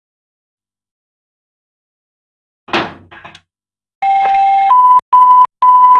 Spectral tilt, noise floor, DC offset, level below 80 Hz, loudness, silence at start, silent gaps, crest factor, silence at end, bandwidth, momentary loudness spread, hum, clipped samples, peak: -4 dB/octave; -85 dBFS; under 0.1%; -60 dBFS; -9 LUFS; 2.7 s; 3.95-4.02 s, 5.02-5.12 s; 12 dB; 0 s; 11.5 kHz; 12 LU; none; under 0.1%; 0 dBFS